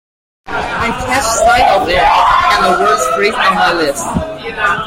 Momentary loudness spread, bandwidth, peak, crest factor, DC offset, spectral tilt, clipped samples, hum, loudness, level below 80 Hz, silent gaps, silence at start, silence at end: 10 LU; 16.5 kHz; 0 dBFS; 12 dB; under 0.1%; -3 dB/octave; under 0.1%; none; -11 LUFS; -32 dBFS; none; 0.45 s; 0 s